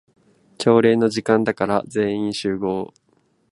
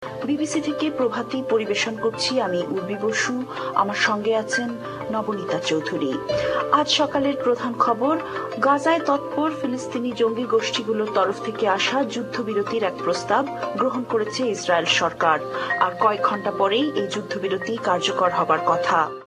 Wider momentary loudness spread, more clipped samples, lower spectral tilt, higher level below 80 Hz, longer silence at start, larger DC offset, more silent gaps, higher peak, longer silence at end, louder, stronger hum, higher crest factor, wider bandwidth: first, 9 LU vs 6 LU; neither; first, -6 dB/octave vs -4 dB/octave; about the same, -58 dBFS vs -60 dBFS; first, 0.6 s vs 0 s; neither; neither; about the same, -2 dBFS vs -4 dBFS; first, 0.65 s vs 0 s; about the same, -20 LUFS vs -22 LUFS; neither; about the same, 20 dB vs 18 dB; second, 11.5 kHz vs 13 kHz